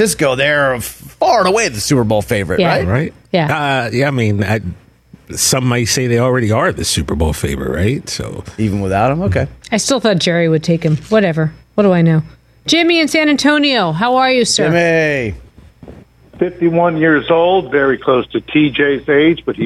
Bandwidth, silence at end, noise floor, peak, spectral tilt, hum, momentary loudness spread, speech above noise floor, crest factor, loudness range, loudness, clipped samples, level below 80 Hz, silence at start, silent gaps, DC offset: 14.5 kHz; 0 s; -38 dBFS; -2 dBFS; -4.5 dB/octave; none; 8 LU; 25 dB; 12 dB; 4 LU; -14 LUFS; under 0.1%; -36 dBFS; 0 s; none; under 0.1%